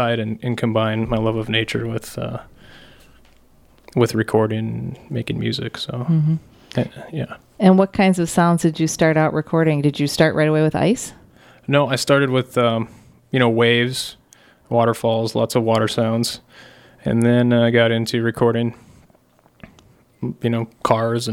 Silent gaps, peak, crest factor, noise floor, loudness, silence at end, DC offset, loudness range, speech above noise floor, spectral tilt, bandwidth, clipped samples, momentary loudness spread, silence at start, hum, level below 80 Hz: none; 0 dBFS; 18 dB; -55 dBFS; -19 LUFS; 0 s; under 0.1%; 6 LU; 37 dB; -6 dB/octave; 16.5 kHz; under 0.1%; 12 LU; 0 s; none; -50 dBFS